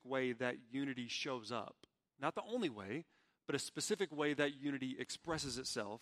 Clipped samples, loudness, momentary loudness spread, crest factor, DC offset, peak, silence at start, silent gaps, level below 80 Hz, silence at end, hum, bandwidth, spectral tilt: under 0.1%; -42 LUFS; 8 LU; 22 dB; under 0.1%; -20 dBFS; 0.05 s; none; -74 dBFS; 0.05 s; none; 15 kHz; -3.5 dB/octave